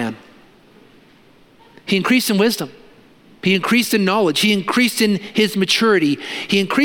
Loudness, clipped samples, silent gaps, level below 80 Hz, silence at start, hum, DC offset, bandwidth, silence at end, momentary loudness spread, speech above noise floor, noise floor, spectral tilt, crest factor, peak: -17 LUFS; under 0.1%; none; -62 dBFS; 0 s; none; under 0.1%; 17 kHz; 0 s; 9 LU; 33 dB; -50 dBFS; -4 dB/octave; 16 dB; -2 dBFS